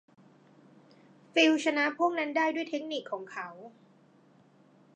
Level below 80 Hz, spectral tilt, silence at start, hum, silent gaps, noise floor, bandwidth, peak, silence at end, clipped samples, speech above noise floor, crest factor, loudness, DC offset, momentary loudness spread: -88 dBFS; -3 dB/octave; 1.35 s; none; none; -61 dBFS; 9.4 kHz; -12 dBFS; 1.25 s; under 0.1%; 32 dB; 22 dB; -29 LUFS; under 0.1%; 16 LU